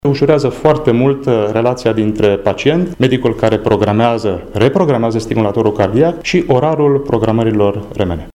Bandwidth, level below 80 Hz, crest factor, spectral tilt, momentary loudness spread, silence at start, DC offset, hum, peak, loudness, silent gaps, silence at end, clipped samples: 12 kHz; -36 dBFS; 12 dB; -7 dB/octave; 3 LU; 0.05 s; under 0.1%; none; 0 dBFS; -13 LUFS; none; 0.05 s; under 0.1%